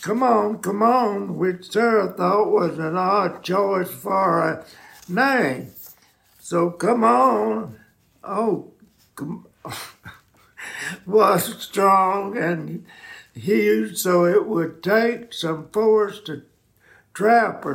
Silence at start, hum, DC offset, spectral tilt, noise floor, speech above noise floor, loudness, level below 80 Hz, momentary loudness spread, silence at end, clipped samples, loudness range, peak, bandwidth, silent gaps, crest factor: 0 s; none; under 0.1%; -5.5 dB/octave; -56 dBFS; 36 dB; -20 LUFS; -68 dBFS; 18 LU; 0 s; under 0.1%; 4 LU; -4 dBFS; 16.5 kHz; none; 16 dB